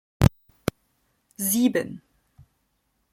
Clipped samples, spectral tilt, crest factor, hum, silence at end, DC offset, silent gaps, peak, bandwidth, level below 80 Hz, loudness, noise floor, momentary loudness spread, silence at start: under 0.1%; -5.5 dB/octave; 24 dB; none; 1.15 s; under 0.1%; none; -2 dBFS; 16.5 kHz; -44 dBFS; -25 LUFS; -72 dBFS; 13 LU; 0.2 s